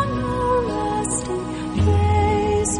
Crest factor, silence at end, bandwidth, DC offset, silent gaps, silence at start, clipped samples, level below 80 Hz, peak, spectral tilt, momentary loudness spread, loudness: 12 dB; 0 s; 10.5 kHz; under 0.1%; none; 0 s; under 0.1%; -32 dBFS; -8 dBFS; -5.5 dB/octave; 8 LU; -21 LUFS